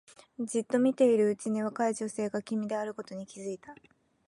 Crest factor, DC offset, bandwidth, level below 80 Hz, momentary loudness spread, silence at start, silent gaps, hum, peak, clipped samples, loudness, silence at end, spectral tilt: 18 dB; under 0.1%; 11.5 kHz; -78 dBFS; 16 LU; 0.4 s; none; none; -14 dBFS; under 0.1%; -30 LUFS; 0.55 s; -5.5 dB/octave